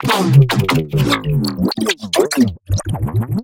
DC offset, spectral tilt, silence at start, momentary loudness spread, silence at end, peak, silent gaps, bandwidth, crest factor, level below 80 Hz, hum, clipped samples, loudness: under 0.1%; -5.5 dB/octave; 0 s; 8 LU; 0 s; 0 dBFS; none; 17 kHz; 16 dB; -36 dBFS; none; under 0.1%; -16 LUFS